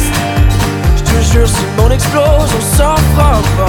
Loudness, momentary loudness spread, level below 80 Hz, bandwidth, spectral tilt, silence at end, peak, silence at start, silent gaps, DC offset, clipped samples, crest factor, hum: -11 LUFS; 3 LU; -14 dBFS; 19 kHz; -5 dB/octave; 0 s; 0 dBFS; 0 s; none; under 0.1%; under 0.1%; 10 dB; none